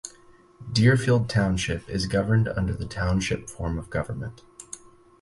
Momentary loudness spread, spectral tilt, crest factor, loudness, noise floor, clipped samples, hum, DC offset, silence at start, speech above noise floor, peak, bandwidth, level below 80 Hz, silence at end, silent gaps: 20 LU; -6 dB/octave; 18 dB; -25 LUFS; -54 dBFS; under 0.1%; none; under 0.1%; 0.05 s; 30 dB; -8 dBFS; 11.5 kHz; -40 dBFS; 0.45 s; none